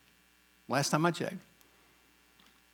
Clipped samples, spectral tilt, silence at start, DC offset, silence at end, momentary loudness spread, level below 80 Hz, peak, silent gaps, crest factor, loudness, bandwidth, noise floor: under 0.1%; -4.5 dB/octave; 0.7 s; under 0.1%; 1.35 s; 12 LU; -78 dBFS; -12 dBFS; none; 24 dB; -32 LUFS; 19.5 kHz; -66 dBFS